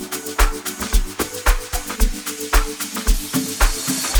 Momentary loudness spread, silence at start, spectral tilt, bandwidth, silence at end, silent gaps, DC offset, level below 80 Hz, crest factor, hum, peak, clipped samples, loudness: 5 LU; 0 s; -3 dB/octave; over 20 kHz; 0 s; none; under 0.1%; -22 dBFS; 18 dB; none; -2 dBFS; under 0.1%; -22 LUFS